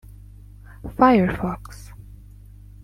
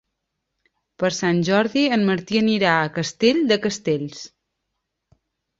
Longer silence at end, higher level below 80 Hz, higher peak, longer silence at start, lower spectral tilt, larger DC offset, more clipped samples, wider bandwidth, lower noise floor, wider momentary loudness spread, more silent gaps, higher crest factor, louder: second, 0.7 s vs 1.35 s; first, -42 dBFS vs -60 dBFS; about the same, -2 dBFS vs -2 dBFS; second, 0.85 s vs 1 s; first, -7.5 dB/octave vs -5 dB/octave; neither; neither; first, 15.5 kHz vs 7.8 kHz; second, -44 dBFS vs -78 dBFS; first, 25 LU vs 7 LU; neither; about the same, 22 dB vs 20 dB; about the same, -19 LUFS vs -20 LUFS